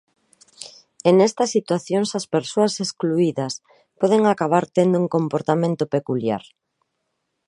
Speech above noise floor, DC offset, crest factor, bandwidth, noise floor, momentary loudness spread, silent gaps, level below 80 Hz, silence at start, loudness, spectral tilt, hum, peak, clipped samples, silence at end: 56 dB; under 0.1%; 20 dB; 11.5 kHz; -75 dBFS; 12 LU; none; -68 dBFS; 0.6 s; -20 LUFS; -5.5 dB/octave; none; -2 dBFS; under 0.1%; 1.1 s